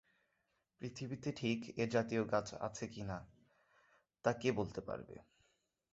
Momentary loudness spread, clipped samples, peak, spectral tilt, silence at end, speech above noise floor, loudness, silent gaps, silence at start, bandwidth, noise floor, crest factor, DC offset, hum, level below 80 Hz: 13 LU; under 0.1%; -18 dBFS; -5.5 dB/octave; 0.7 s; 43 dB; -41 LUFS; none; 0.8 s; 8 kHz; -83 dBFS; 24 dB; under 0.1%; none; -68 dBFS